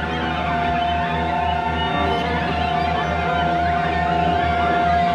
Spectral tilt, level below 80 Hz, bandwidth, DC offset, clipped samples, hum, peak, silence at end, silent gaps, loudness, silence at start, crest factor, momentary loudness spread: -6.5 dB/octave; -34 dBFS; 9.2 kHz; under 0.1%; under 0.1%; none; -8 dBFS; 0 s; none; -20 LUFS; 0 s; 12 dB; 3 LU